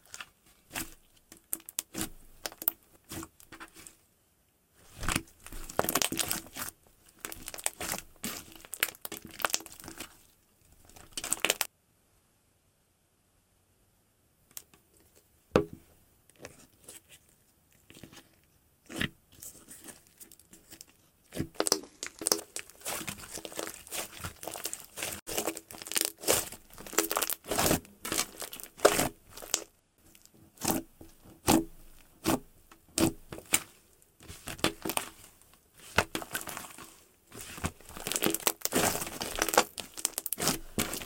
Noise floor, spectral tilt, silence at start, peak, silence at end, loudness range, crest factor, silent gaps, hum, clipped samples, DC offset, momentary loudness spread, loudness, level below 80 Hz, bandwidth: -71 dBFS; -2.5 dB/octave; 0.1 s; -6 dBFS; 0 s; 9 LU; 30 dB; 25.22-25.26 s; none; under 0.1%; under 0.1%; 22 LU; -32 LUFS; -54 dBFS; 17 kHz